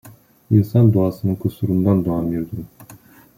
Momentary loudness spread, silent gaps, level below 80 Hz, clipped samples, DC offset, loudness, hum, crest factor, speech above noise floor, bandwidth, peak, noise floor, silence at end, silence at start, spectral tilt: 14 LU; none; -50 dBFS; under 0.1%; under 0.1%; -18 LUFS; none; 16 dB; 28 dB; 16 kHz; -2 dBFS; -45 dBFS; 0.45 s; 0.05 s; -10.5 dB/octave